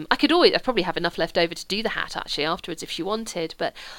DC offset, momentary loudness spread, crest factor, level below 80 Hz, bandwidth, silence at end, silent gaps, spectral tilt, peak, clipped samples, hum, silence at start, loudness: under 0.1%; 12 LU; 22 dB; -48 dBFS; 17.5 kHz; 0 s; none; -3.5 dB/octave; -4 dBFS; under 0.1%; none; 0 s; -24 LUFS